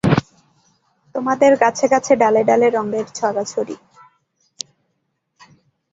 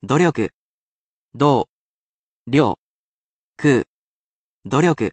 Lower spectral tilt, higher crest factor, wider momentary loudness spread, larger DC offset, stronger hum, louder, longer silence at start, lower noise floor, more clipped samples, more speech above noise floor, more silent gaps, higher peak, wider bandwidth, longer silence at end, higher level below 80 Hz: about the same, -5.5 dB/octave vs -6.5 dB/octave; about the same, 18 dB vs 18 dB; first, 19 LU vs 11 LU; neither; neither; about the same, -17 LUFS vs -19 LUFS; about the same, 0.05 s vs 0.05 s; second, -71 dBFS vs under -90 dBFS; neither; second, 55 dB vs over 73 dB; second, none vs 0.53-1.29 s, 1.69-2.45 s, 2.78-3.52 s, 3.87-4.62 s; about the same, -2 dBFS vs -2 dBFS; about the same, 8.4 kHz vs 9.2 kHz; first, 2.15 s vs 0 s; first, -52 dBFS vs -58 dBFS